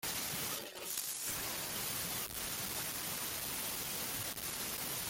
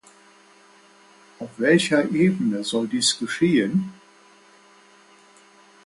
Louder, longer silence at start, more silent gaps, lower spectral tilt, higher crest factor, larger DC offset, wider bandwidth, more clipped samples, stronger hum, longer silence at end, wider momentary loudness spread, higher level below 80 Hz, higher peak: second, -38 LUFS vs -21 LUFS; second, 0 s vs 1.4 s; neither; second, -1 dB/octave vs -4.5 dB/octave; about the same, 24 dB vs 20 dB; neither; first, 17 kHz vs 11.5 kHz; neither; neither; second, 0 s vs 1.9 s; second, 2 LU vs 11 LU; about the same, -64 dBFS vs -66 dBFS; second, -16 dBFS vs -6 dBFS